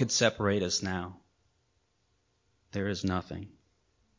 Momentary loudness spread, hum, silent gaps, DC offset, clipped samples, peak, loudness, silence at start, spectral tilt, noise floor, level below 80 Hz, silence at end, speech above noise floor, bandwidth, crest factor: 18 LU; none; none; under 0.1%; under 0.1%; -10 dBFS; -31 LUFS; 0 s; -4 dB/octave; -74 dBFS; -54 dBFS; 0.7 s; 43 dB; 7.6 kHz; 24 dB